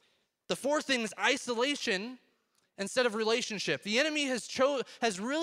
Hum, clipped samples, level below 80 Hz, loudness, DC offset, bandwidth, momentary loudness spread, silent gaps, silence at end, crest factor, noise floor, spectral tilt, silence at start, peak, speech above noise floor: none; under 0.1%; -78 dBFS; -31 LUFS; under 0.1%; 15.5 kHz; 6 LU; none; 0 s; 20 dB; -74 dBFS; -2.5 dB/octave; 0.5 s; -12 dBFS; 43 dB